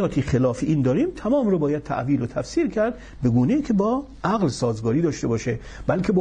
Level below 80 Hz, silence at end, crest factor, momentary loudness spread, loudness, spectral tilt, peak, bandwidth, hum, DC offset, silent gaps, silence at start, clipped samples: -42 dBFS; 0 s; 14 dB; 5 LU; -23 LUFS; -7.5 dB/octave; -8 dBFS; 10 kHz; none; under 0.1%; none; 0 s; under 0.1%